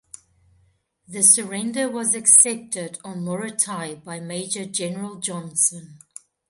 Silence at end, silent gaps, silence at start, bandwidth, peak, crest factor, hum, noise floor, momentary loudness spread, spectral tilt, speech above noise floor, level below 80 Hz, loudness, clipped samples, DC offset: 0.55 s; none; 1.1 s; 12 kHz; 0 dBFS; 24 dB; none; -63 dBFS; 19 LU; -2.5 dB/octave; 41 dB; -70 dBFS; -19 LUFS; under 0.1%; under 0.1%